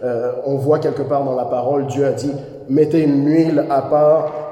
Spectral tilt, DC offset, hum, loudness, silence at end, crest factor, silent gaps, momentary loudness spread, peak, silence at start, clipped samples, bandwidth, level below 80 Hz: -8 dB/octave; under 0.1%; none; -17 LUFS; 0 s; 14 dB; none; 7 LU; -2 dBFS; 0 s; under 0.1%; 11.5 kHz; -58 dBFS